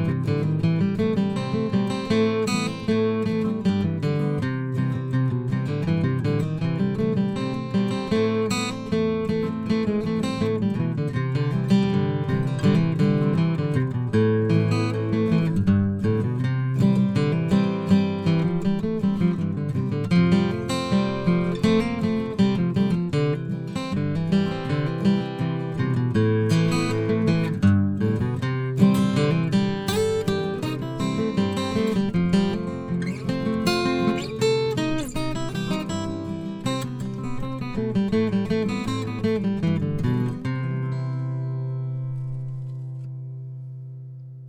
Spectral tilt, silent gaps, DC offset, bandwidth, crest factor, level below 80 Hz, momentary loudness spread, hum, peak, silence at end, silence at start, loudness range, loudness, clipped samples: -7.5 dB/octave; none; under 0.1%; 14.5 kHz; 18 dB; -48 dBFS; 8 LU; none; -4 dBFS; 0 s; 0 s; 5 LU; -24 LUFS; under 0.1%